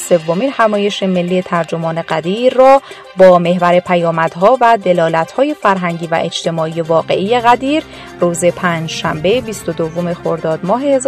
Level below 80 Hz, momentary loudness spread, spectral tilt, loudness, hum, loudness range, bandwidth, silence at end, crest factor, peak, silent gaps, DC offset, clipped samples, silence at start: -50 dBFS; 9 LU; -5.5 dB/octave; -13 LUFS; none; 4 LU; 13.5 kHz; 0 s; 12 dB; 0 dBFS; none; under 0.1%; 0.3%; 0 s